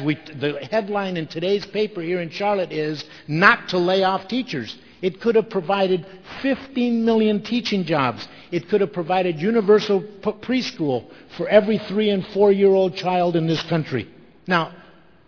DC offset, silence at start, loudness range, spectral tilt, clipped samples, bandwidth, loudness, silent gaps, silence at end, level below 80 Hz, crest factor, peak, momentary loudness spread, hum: 0.2%; 0 s; 3 LU; -6.5 dB/octave; under 0.1%; 5.4 kHz; -21 LUFS; none; 0.5 s; -60 dBFS; 20 dB; 0 dBFS; 11 LU; none